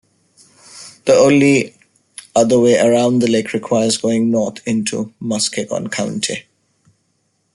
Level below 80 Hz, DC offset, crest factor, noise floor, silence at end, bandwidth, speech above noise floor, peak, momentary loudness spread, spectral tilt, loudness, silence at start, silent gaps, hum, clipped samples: -58 dBFS; under 0.1%; 16 dB; -65 dBFS; 1.15 s; 11.5 kHz; 50 dB; -2 dBFS; 11 LU; -4.5 dB/octave; -15 LUFS; 0.75 s; none; none; under 0.1%